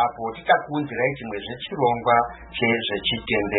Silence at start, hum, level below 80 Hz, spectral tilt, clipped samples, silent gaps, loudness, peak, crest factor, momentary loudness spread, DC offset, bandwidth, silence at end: 0 s; none; -50 dBFS; -9.5 dB/octave; under 0.1%; none; -23 LUFS; -4 dBFS; 18 dB; 11 LU; under 0.1%; 4.1 kHz; 0 s